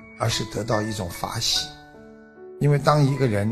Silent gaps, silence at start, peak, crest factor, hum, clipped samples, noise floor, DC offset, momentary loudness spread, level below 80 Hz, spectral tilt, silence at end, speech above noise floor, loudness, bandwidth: none; 0 s; -2 dBFS; 22 dB; none; under 0.1%; -46 dBFS; under 0.1%; 10 LU; -48 dBFS; -5 dB/octave; 0 s; 24 dB; -23 LUFS; 14.5 kHz